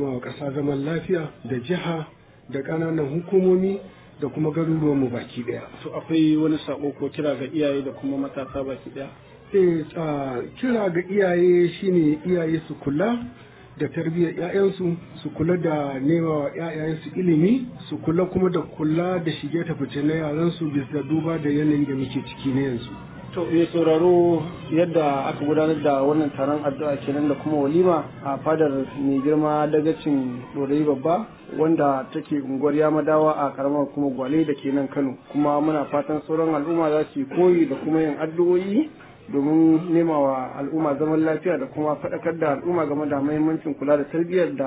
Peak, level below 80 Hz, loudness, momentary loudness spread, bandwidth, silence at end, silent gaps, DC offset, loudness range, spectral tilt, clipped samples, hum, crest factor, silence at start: -6 dBFS; -56 dBFS; -23 LUFS; 10 LU; 4 kHz; 0 s; none; under 0.1%; 3 LU; -12 dB/octave; under 0.1%; none; 16 dB; 0 s